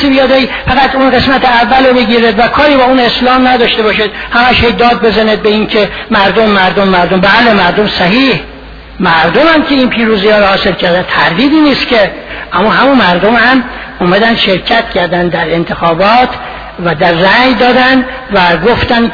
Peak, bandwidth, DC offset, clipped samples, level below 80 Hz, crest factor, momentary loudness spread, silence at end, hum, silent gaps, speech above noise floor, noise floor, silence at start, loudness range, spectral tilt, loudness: 0 dBFS; 5.4 kHz; under 0.1%; 0.7%; -30 dBFS; 8 dB; 5 LU; 0 s; none; none; 20 dB; -28 dBFS; 0 s; 2 LU; -6.5 dB/octave; -7 LUFS